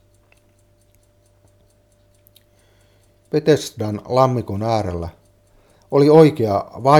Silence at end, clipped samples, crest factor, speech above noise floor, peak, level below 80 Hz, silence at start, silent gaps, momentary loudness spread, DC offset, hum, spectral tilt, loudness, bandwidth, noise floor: 0 s; under 0.1%; 20 dB; 41 dB; 0 dBFS; -50 dBFS; 3.35 s; none; 15 LU; under 0.1%; none; -7 dB/octave; -17 LUFS; 15.5 kHz; -56 dBFS